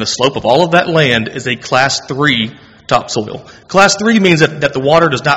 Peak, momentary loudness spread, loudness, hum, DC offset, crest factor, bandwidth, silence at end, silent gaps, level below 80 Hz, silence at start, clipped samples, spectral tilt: 0 dBFS; 10 LU; -12 LUFS; none; under 0.1%; 12 dB; 13.5 kHz; 0 s; none; -46 dBFS; 0 s; 0.4%; -4 dB/octave